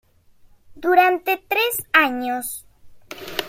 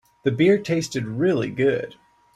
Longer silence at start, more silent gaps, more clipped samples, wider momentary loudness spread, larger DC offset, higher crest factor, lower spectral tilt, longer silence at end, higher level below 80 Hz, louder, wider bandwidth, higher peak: first, 0.7 s vs 0.25 s; neither; neither; first, 18 LU vs 9 LU; neither; about the same, 20 dB vs 16 dB; second, -2 dB/octave vs -6 dB/octave; second, 0 s vs 0.45 s; about the same, -58 dBFS vs -60 dBFS; first, -19 LUFS vs -22 LUFS; first, 16.5 kHz vs 13 kHz; first, -2 dBFS vs -6 dBFS